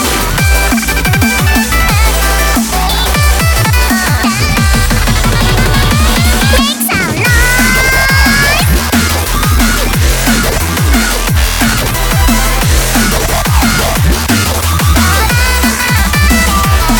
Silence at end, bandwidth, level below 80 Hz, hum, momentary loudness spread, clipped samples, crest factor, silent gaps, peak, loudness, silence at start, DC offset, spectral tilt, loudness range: 0 s; 19.5 kHz; -14 dBFS; none; 3 LU; under 0.1%; 8 dB; none; 0 dBFS; -9 LUFS; 0 s; under 0.1%; -3.5 dB/octave; 2 LU